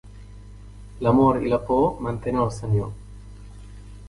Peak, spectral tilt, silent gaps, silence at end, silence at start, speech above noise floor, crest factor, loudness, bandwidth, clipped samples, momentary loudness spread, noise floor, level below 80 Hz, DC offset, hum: -6 dBFS; -8.5 dB/octave; none; 0 s; 0.05 s; 21 dB; 18 dB; -22 LUFS; 11.5 kHz; under 0.1%; 26 LU; -42 dBFS; -42 dBFS; under 0.1%; 50 Hz at -40 dBFS